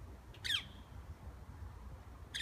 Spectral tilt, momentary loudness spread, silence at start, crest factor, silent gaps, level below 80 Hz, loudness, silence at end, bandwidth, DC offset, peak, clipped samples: -2 dB/octave; 17 LU; 0 s; 22 dB; none; -54 dBFS; -44 LUFS; 0 s; 15.5 kHz; under 0.1%; -24 dBFS; under 0.1%